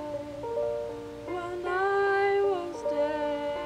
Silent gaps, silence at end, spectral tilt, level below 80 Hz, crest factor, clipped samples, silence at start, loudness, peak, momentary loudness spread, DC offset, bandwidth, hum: none; 0 s; -5.5 dB/octave; -58 dBFS; 12 dB; under 0.1%; 0 s; -29 LUFS; -16 dBFS; 12 LU; under 0.1%; 10.5 kHz; none